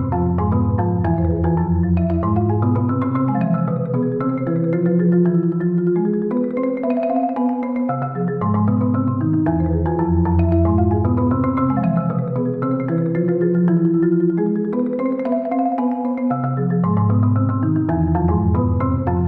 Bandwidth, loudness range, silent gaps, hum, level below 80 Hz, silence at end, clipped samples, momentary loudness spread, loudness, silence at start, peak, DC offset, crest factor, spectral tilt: 3 kHz; 2 LU; none; none; -36 dBFS; 0 s; under 0.1%; 4 LU; -19 LUFS; 0 s; -6 dBFS; under 0.1%; 12 dB; -13 dB/octave